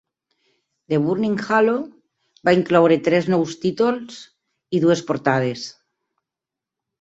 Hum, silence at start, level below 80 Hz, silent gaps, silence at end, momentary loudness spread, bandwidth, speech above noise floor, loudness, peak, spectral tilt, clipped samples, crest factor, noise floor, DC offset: none; 0.9 s; -62 dBFS; none; 1.3 s; 15 LU; 8 kHz; 68 dB; -19 LUFS; -2 dBFS; -6.5 dB/octave; under 0.1%; 18 dB; -87 dBFS; under 0.1%